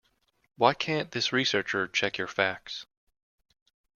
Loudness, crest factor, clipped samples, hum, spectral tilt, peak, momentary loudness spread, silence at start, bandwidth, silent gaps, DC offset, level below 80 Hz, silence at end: -27 LUFS; 26 dB; under 0.1%; none; -3.5 dB/octave; -6 dBFS; 10 LU; 0.6 s; 7.4 kHz; none; under 0.1%; -70 dBFS; 1.15 s